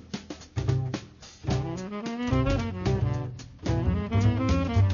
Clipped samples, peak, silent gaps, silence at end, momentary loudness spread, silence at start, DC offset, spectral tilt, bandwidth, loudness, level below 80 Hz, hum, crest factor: under 0.1%; -12 dBFS; none; 0 s; 13 LU; 0 s; under 0.1%; -7 dB/octave; 7.2 kHz; -28 LUFS; -38 dBFS; none; 14 dB